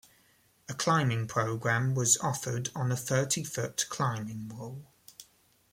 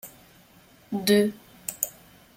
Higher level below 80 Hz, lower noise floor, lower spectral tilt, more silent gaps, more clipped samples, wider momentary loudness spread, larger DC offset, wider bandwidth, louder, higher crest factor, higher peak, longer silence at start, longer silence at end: about the same, -68 dBFS vs -66 dBFS; first, -66 dBFS vs -55 dBFS; about the same, -4 dB/octave vs -4 dB/octave; neither; neither; first, 19 LU vs 15 LU; neither; about the same, 16.5 kHz vs 16.5 kHz; second, -30 LUFS vs -26 LUFS; about the same, 22 dB vs 24 dB; second, -10 dBFS vs -6 dBFS; first, 0.7 s vs 0.05 s; about the same, 0.5 s vs 0.45 s